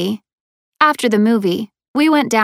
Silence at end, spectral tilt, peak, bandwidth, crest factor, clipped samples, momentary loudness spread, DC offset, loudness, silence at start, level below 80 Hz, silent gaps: 0 s; -5 dB/octave; 0 dBFS; 15.5 kHz; 16 dB; under 0.1%; 10 LU; under 0.1%; -16 LUFS; 0 s; -64 dBFS; 0.33-0.72 s, 1.88-1.94 s